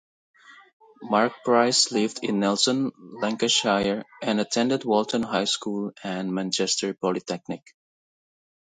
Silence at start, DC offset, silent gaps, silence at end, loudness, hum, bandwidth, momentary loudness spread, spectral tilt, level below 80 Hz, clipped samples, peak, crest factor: 0.5 s; under 0.1%; 0.73-0.80 s; 1.1 s; -24 LUFS; none; 9.6 kHz; 11 LU; -3 dB/octave; -66 dBFS; under 0.1%; -6 dBFS; 20 dB